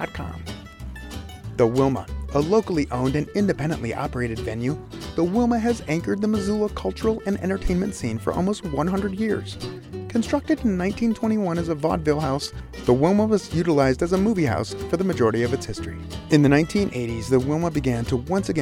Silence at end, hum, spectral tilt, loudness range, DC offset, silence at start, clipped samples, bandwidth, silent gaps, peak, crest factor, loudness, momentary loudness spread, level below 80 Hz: 0 s; none; -6.5 dB/octave; 3 LU; under 0.1%; 0 s; under 0.1%; 16 kHz; none; -4 dBFS; 20 dB; -23 LUFS; 13 LU; -38 dBFS